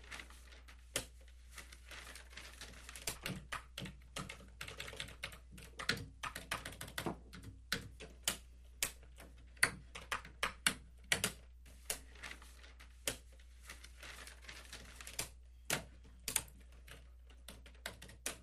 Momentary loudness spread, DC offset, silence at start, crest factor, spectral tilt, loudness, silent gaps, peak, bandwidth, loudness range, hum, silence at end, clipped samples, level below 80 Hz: 20 LU; under 0.1%; 0 s; 34 dB; -1.5 dB/octave; -43 LUFS; none; -12 dBFS; 15 kHz; 9 LU; none; 0 s; under 0.1%; -58 dBFS